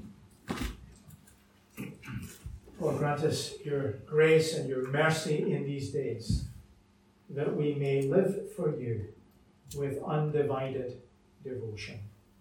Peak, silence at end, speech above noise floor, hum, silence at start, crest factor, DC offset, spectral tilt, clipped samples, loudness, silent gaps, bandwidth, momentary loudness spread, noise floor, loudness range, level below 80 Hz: -12 dBFS; 0.3 s; 33 dB; none; 0 s; 20 dB; under 0.1%; -6 dB/octave; under 0.1%; -32 LUFS; none; 17 kHz; 18 LU; -63 dBFS; 6 LU; -50 dBFS